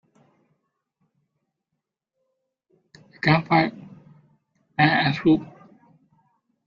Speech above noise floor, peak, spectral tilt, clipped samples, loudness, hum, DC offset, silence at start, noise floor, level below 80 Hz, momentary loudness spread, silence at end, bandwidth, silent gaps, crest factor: 62 dB; -2 dBFS; -7.5 dB/octave; under 0.1%; -21 LUFS; none; under 0.1%; 3.25 s; -82 dBFS; -62 dBFS; 10 LU; 1.2 s; 7 kHz; none; 24 dB